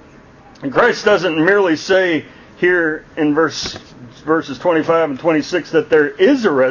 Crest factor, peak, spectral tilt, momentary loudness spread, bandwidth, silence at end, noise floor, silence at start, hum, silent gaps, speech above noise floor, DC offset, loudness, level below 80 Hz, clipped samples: 14 dB; 0 dBFS; -5 dB/octave; 8 LU; 7.4 kHz; 0 s; -42 dBFS; 0.6 s; none; none; 28 dB; under 0.1%; -15 LUFS; -52 dBFS; under 0.1%